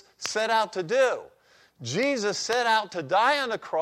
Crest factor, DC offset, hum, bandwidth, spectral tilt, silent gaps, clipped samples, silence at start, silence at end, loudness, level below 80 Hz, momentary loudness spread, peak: 16 dB; under 0.1%; none; 16 kHz; -3 dB/octave; none; under 0.1%; 0.2 s; 0 s; -25 LUFS; -74 dBFS; 8 LU; -10 dBFS